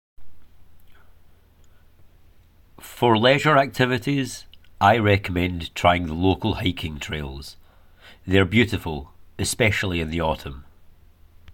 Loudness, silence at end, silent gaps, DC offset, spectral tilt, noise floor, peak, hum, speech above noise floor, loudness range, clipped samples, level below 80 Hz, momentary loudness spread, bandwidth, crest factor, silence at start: -21 LUFS; 0 s; none; under 0.1%; -5 dB/octave; -52 dBFS; -4 dBFS; none; 31 dB; 5 LU; under 0.1%; -44 dBFS; 18 LU; 17 kHz; 20 dB; 0.2 s